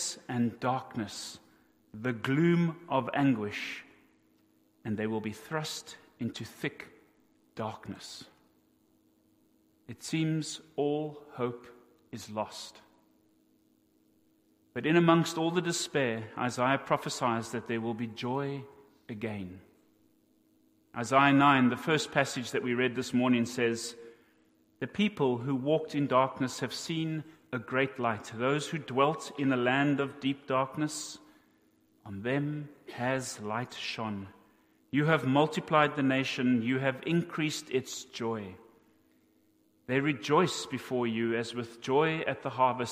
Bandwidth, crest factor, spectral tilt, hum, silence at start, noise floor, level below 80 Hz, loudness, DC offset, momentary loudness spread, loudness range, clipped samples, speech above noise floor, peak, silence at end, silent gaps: 15.5 kHz; 24 dB; -5 dB/octave; none; 0 s; -68 dBFS; -72 dBFS; -31 LUFS; under 0.1%; 15 LU; 10 LU; under 0.1%; 38 dB; -8 dBFS; 0 s; none